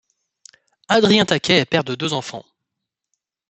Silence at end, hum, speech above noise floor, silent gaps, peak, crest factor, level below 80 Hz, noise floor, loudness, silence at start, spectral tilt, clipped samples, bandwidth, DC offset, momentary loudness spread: 1.1 s; none; 64 dB; none; 0 dBFS; 22 dB; -60 dBFS; -82 dBFS; -17 LUFS; 0.9 s; -4.5 dB/octave; under 0.1%; 8.4 kHz; under 0.1%; 14 LU